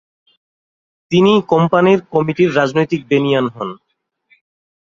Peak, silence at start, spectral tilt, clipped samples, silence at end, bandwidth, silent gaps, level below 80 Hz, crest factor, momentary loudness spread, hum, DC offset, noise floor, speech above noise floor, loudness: 0 dBFS; 1.1 s; -7 dB/octave; under 0.1%; 1.15 s; 7.4 kHz; none; -56 dBFS; 16 dB; 7 LU; none; under 0.1%; -58 dBFS; 44 dB; -14 LUFS